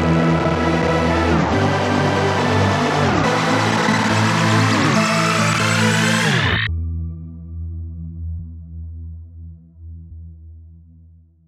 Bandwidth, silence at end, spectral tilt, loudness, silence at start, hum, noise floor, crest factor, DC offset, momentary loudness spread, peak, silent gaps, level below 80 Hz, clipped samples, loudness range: 14.5 kHz; 0.7 s; -5 dB/octave; -17 LUFS; 0 s; none; -47 dBFS; 14 dB; under 0.1%; 19 LU; -4 dBFS; none; -36 dBFS; under 0.1%; 17 LU